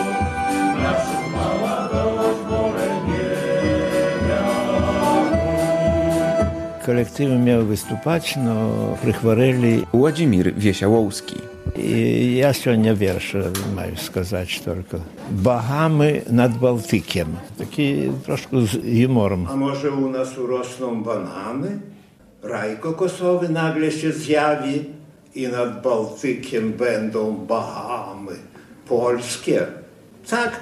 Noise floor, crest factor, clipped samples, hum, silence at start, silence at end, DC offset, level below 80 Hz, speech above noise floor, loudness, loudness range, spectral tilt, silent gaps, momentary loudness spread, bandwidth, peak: -48 dBFS; 18 dB; under 0.1%; none; 0 s; 0 s; under 0.1%; -46 dBFS; 28 dB; -21 LUFS; 5 LU; -6.5 dB/octave; none; 10 LU; 14.5 kHz; -2 dBFS